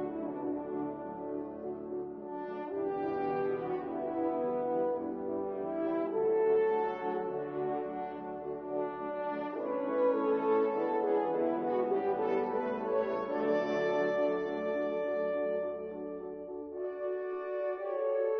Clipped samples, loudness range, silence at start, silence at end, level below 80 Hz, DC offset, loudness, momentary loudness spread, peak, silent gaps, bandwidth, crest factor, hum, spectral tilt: under 0.1%; 5 LU; 0 s; 0 s; -72 dBFS; under 0.1%; -34 LUFS; 10 LU; -18 dBFS; none; 6.2 kHz; 14 dB; none; -5.5 dB/octave